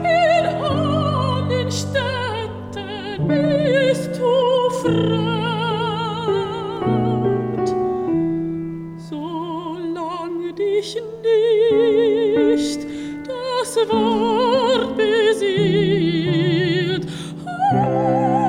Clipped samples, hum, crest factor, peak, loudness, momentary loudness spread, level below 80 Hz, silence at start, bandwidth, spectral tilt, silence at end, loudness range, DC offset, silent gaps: under 0.1%; none; 12 dB; -6 dBFS; -19 LUFS; 11 LU; -50 dBFS; 0 s; 14 kHz; -6 dB/octave; 0 s; 5 LU; under 0.1%; none